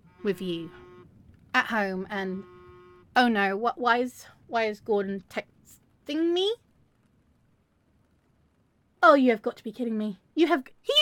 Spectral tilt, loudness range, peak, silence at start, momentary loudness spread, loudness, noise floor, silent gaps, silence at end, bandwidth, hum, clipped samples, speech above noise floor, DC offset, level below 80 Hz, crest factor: -4.5 dB/octave; 7 LU; -4 dBFS; 0.2 s; 14 LU; -26 LUFS; -67 dBFS; none; 0 s; 17 kHz; none; under 0.1%; 42 dB; under 0.1%; -68 dBFS; 24 dB